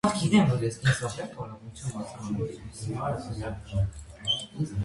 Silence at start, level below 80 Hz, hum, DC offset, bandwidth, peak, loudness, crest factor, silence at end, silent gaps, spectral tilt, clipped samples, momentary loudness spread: 0.05 s; -46 dBFS; none; under 0.1%; 11.5 kHz; -8 dBFS; -29 LUFS; 20 dB; 0 s; none; -5.5 dB/octave; under 0.1%; 15 LU